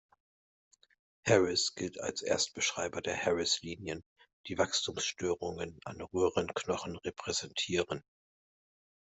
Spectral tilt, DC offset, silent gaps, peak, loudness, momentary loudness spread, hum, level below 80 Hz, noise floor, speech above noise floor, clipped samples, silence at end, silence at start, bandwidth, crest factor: -3 dB/octave; under 0.1%; 4.06-4.16 s, 4.33-4.44 s; -12 dBFS; -33 LUFS; 12 LU; none; -68 dBFS; under -90 dBFS; over 56 dB; under 0.1%; 1.2 s; 1.25 s; 8.2 kHz; 24 dB